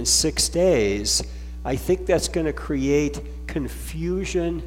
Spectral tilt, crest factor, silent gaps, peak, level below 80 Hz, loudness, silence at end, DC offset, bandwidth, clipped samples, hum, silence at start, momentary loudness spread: -3.5 dB/octave; 16 dB; none; -8 dBFS; -34 dBFS; -23 LUFS; 0 s; under 0.1%; 16.5 kHz; under 0.1%; none; 0 s; 12 LU